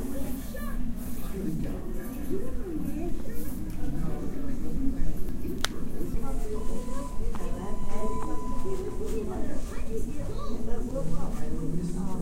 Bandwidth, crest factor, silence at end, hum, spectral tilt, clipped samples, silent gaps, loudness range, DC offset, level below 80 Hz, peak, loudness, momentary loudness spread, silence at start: 15.5 kHz; 20 dB; 0 s; none; -6 dB/octave; under 0.1%; none; 1 LU; under 0.1%; -32 dBFS; -4 dBFS; -35 LUFS; 4 LU; 0 s